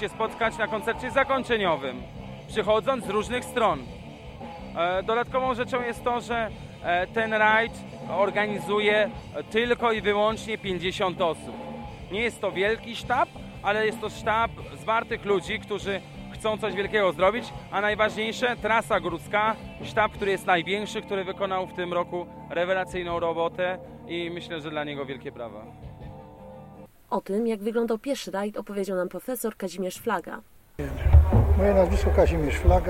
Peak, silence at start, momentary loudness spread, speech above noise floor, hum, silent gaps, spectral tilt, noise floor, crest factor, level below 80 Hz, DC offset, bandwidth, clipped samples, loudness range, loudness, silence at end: -4 dBFS; 0 s; 15 LU; 21 dB; none; none; -5.5 dB/octave; -47 dBFS; 22 dB; -34 dBFS; under 0.1%; 15.5 kHz; under 0.1%; 6 LU; -26 LUFS; 0 s